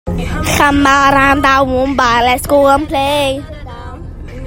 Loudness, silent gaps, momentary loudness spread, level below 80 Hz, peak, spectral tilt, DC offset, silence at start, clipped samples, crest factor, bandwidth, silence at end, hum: -11 LUFS; none; 20 LU; -28 dBFS; 0 dBFS; -4.5 dB/octave; under 0.1%; 0.05 s; under 0.1%; 12 dB; 16.5 kHz; 0 s; none